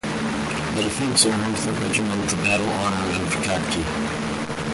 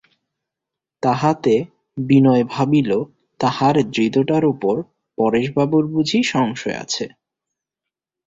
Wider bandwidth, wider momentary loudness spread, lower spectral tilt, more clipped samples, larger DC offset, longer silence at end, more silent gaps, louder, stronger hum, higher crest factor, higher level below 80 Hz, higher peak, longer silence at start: first, 11.5 kHz vs 7.8 kHz; about the same, 7 LU vs 9 LU; second, -3.5 dB/octave vs -6 dB/octave; neither; neither; second, 0 s vs 1.2 s; neither; second, -22 LUFS vs -18 LUFS; neither; about the same, 20 dB vs 16 dB; first, -42 dBFS vs -58 dBFS; about the same, -2 dBFS vs -4 dBFS; second, 0.05 s vs 1.05 s